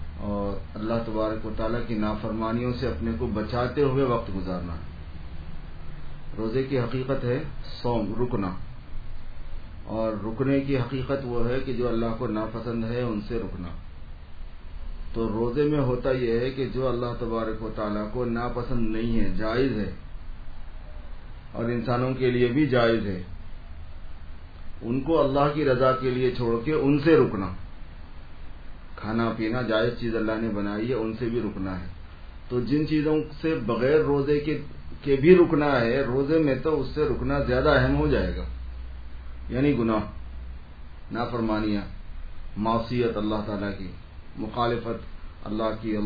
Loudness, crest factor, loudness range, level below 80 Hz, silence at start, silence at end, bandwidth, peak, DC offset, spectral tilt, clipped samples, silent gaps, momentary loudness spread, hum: -26 LUFS; 22 dB; 8 LU; -36 dBFS; 0 s; 0 s; 5 kHz; -4 dBFS; 0.2%; -9.5 dB/octave; under 0.1%; none; 22 LU; none